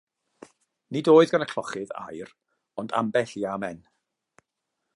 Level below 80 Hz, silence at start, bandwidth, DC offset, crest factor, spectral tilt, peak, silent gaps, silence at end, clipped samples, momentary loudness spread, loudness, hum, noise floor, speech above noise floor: -70 dBFS; 0.9 s; 11.5 kHz; under 0.1%; 22 dB; -6 dB/octave; -6 dBFS; none; 1.2 s; under 0.1%; 23 LU; -24 LUFS; none; -82 dBFS; 58 dB